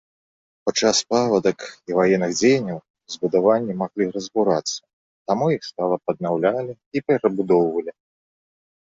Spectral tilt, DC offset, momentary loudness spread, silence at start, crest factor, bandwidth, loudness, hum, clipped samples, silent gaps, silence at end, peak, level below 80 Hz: -4.5 dB/octave; under 0.1%; 10 LU; 0.65 s; 18 dB; 8 kHz; -21 LUFS; none; under 0.1%; 2.90-2.94 s, 4.93-5.25 s, 6.86-6.91 s; 1.05 s; -4 dBFS; -62 dBFS